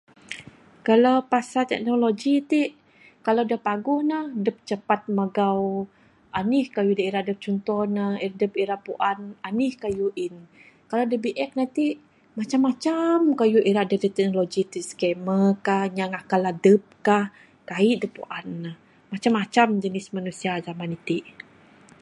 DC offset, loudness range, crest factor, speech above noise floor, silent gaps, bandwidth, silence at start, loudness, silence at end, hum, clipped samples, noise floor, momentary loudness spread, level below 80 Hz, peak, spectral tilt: under 0.1%; 4 LU; 20 dB; 29 dB; none; 11.5 kHz; 0.3 s; -24 LUFS; 0.7 s; none; under 0.1%; -52 dBFS; 13 LU; -66 dBFS; -4 dBFS; -6 dB/octave